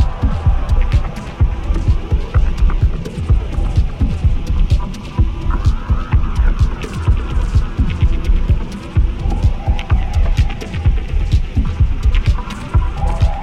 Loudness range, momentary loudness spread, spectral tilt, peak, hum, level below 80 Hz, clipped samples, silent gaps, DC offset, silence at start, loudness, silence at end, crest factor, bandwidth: 1 LU; 3 LU; -7.5 dB/octave; -2 dBFS; none; -16 dBFS; under 0.1%; none; under 0.1%; 0 s; -18 LUFS; 0 s; 12 dB; 8.6 kHz